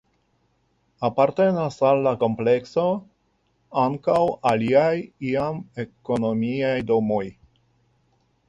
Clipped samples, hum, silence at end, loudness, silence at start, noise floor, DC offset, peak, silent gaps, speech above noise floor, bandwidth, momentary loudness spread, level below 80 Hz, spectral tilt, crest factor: under 0.1%; none; 1.15 s; -22 LUFS; 1 s; -68 dBFS; under 0.1%; -6 dBFS; none; 46 dB; 10.5 kHz; 9 LU; -58 dBFS; -7.5 dB/octave; 18 dB